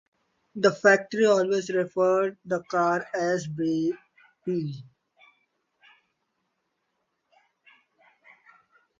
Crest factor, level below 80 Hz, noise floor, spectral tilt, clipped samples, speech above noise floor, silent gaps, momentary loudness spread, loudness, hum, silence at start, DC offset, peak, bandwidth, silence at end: 22 dB; -74 dBFS; -77 dBFS; -5.5 dB/octave; under 0.1%; 53 dB; none; 14 LU; -25 LUFS; none; 0.55 s; under 0.1%; -6 dBFS; 7.8 kHz; 4.15 s